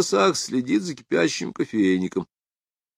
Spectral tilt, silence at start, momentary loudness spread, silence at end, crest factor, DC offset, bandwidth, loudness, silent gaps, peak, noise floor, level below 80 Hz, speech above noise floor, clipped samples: -4.5 dB/octave; 0 s; 8 LU; 0.75 s; 18 dB; under 0.1%; 14 kHz; -23 LUFS; none; -6 dBFS; under -90 dBFS; -68 dBFS; over 68 dB; under 0.1%